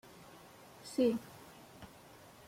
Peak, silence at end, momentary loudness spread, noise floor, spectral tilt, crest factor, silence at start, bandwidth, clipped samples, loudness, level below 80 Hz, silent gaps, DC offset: -20 dBFS; 0.6 s; 23 LU; -58 dBFS; -5.5 dB/octave; 20 dB; 0.85 s; 16.5 kHz; under 0.1%; -35 LUFS; -72 dBFS; none; under 0.1%